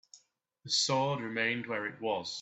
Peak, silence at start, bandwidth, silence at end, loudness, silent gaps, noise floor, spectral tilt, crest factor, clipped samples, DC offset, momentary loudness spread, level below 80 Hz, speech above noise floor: -18 dBFS; 0.15 s; 8.6 kHz; 0 s; -32 LUFS; none; -68 dBFS; -3 dB/octave; 16 dB; under 0.1%; under 0.1%; 7 LU; -78 dBFS; 35 dB